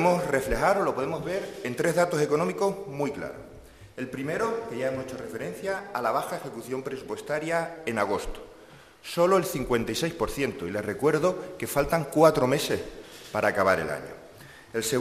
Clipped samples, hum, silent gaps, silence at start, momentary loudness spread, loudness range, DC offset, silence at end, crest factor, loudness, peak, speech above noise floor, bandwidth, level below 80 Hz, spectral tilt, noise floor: under 0.1%; none; none; 0 s; 14 LU; 6 LU; under 0.1%; 0 s; 22 dB; -27 LUFS; -6 dBFS; 24 dB; 15 kHz; -48 dBFS; -5 dB/octave; -51 dBFS